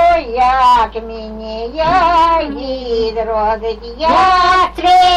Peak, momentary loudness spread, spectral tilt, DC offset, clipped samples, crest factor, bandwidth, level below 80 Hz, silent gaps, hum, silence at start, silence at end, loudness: -2 dBFS; 14 LU; -4 dB/octave; under 0.1%; under 0.1%; 10 dB; 11 kHz; -32 dBFS; none; none; 0 s; 0 s; -13 LUFS